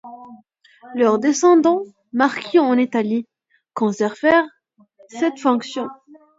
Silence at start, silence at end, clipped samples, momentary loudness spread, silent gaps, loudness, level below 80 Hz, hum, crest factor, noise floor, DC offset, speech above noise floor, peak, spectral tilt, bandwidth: 0.05 s; 0.45 s; under 0.1%; 16 LU; none; -18 LUFS; -66 dBFS; none; 18 dB; -53 dBFS; under 0.1%; 36 dB; -2 dBFS; -4.5 dB/octave; 7.8 kHz